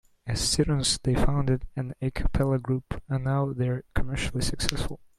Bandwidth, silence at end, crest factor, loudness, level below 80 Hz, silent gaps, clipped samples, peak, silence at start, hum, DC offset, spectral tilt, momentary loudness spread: 15 kHz; 0.2 s; 24 dB; -28 LUFS; -34 dBFS; none; under 0.1%; -2 dBFS; 0.25 s; none; under 0.1%; -5 dB/octave; 8 LU